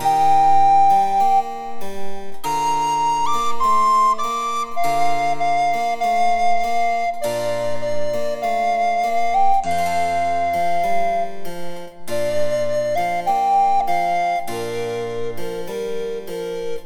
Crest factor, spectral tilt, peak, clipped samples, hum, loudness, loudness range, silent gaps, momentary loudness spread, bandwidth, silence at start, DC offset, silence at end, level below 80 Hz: 12 dB; -4 dB/octave; -6 dBFS; under 0.1%; none; -19 LUFS; 3 LU; none; 12 LU; 18.5 kHz; 0 s; under 0.1%; 0 s; -48 dBFS